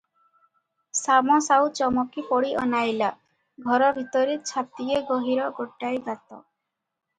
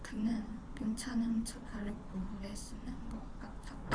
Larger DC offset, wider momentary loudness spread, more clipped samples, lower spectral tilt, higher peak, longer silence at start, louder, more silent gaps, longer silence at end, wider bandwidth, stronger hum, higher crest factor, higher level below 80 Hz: neither; about the same, 11 LU vs 12 LU; neither; second, -3 dB/octave vs -5 dB/octave; first, -6 dBFS vs -20 dBFS; first, 0.95 s vs 0 s; first, -24 LUFS vs -41 LUFS; neither; first, 0.8 s vs 0 s; second, 9.6 kHz vs 11 kHz; neither; about the same, 18 dB vs 20 dB; second, -64 dBFS vs -48 dBFS